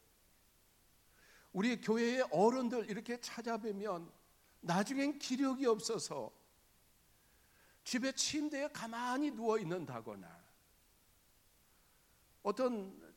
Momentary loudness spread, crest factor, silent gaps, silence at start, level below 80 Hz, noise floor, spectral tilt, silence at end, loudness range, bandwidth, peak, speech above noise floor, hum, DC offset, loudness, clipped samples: 13 LU; 22 dB; none; 1.55 s; -76 dBFS; -70 dBFS; -4 dB/octave; 0.05 s; 6 LU; 17.5 kHz; -18 dBFS; 33 dB; none; under 0.1%; -38 LUFS; under 0.1%